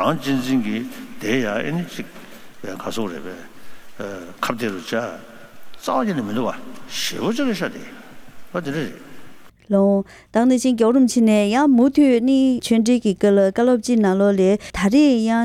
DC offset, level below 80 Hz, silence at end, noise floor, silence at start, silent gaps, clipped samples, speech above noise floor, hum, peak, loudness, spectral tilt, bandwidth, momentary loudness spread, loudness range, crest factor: under 0.1%; -52 dBFS; 0 s; -40 dBFS; 0 s; none; under 0.1%; 22 dB; none; -4 dBFS; -19 LUFS; -5.5 dB/octave; 16 kHz; 17 LU; 12 LU; 16 dB